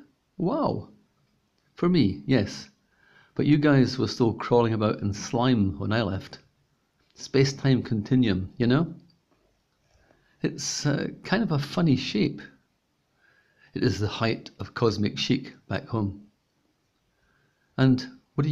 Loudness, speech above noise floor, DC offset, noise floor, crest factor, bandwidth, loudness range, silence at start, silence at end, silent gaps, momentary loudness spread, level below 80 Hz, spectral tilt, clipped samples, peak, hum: -26 LUFS; 47 dB; under 0.1%; -72 dBFS; 18 dB; 11 kHz; 5 LU; 0.4 s; 0 s; none; 11 LU; -56 dBFS; -6 dB/octave; under 0.1%; -8 dBFS; none